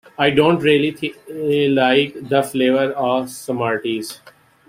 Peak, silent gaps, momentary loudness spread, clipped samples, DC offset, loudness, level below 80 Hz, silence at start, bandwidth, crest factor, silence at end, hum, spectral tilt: -2 dBFS; none; 12 LU; under 0.1%; under 0.1%; -18 LUFS; -58 dBFS; 0.2 s; 16 kHz; 18 dB; 0.5 s; none; -5.5 dB/octave